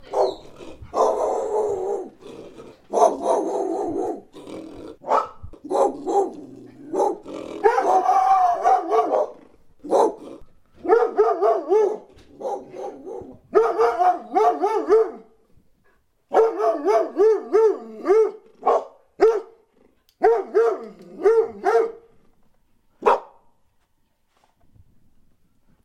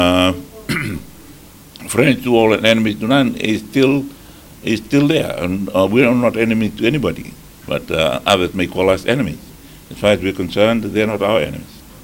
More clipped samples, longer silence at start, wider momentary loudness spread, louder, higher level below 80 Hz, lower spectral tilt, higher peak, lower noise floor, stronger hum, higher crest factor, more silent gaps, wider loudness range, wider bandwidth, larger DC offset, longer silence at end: neither; about the same, 0 s vs 0 s; first, 19 LU vs 13 LU; second, -21 LUFS vs -16 LUFS; second, -58 dBFS vs -42 dBFS; about the same, -5 dB/octave vs -5.5 dB/octave; about the same, -2 dBFS vs 0 dBFS; first, -66 dBFS vs -40 dBFS; neither; about the same, 20 dB vs 16 dB; neither; first, 5 LU vs 2 LU; second, 11 kHz vs 17.5 kHz; neither; first, 2.6 s vs 0 s